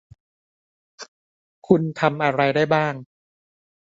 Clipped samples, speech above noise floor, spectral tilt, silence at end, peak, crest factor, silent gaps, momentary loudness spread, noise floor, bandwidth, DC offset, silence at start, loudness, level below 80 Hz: under 0.1%; over 70 dB; -7 dB/octave; 0.95 s; -2 dBFS; 22 dB; 1.08-1.62 s; 23 LU; under -90 dBFS; 7.8 kHz; under 0.1%; 1 s; -20 LUFS; -64 dBFS